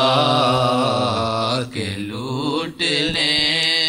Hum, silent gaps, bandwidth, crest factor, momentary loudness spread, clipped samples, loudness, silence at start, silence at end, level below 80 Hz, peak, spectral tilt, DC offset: none; none; 16 kHz; 14 dB; 10 LU; under 0.1%; -18 LUFS; 0 s; 0 s; -50 dBFS; -4 dBFS; -4 dB/octave; under 0.1%